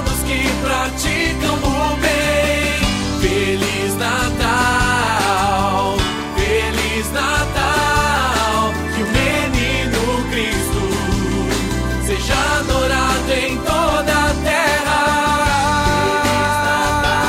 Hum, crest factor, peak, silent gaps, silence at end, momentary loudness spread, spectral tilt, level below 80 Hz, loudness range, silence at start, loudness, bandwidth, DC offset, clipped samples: none; 14 dB; -2 dBFS; none; 0 s; 4 LU; -4 dB/octave; -26 dBFS; 2 LU; 0 s; -17 LUFS; 16 kHz; under 0.1%; under 0.1%